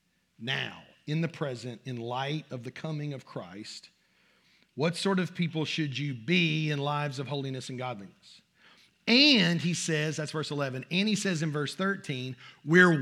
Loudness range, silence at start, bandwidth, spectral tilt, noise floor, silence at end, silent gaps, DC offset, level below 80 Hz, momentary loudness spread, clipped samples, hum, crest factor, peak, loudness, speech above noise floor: 10 LU; 0.4 s; 12.5 kHz; -4.5 dB/octave; -67 dBFS; 0 s; none; under 0.1%; -82 dBFS; 18 LU; under 0.1%; none; 24 dB; -6 dBFS; -29 LUFS; 38 dB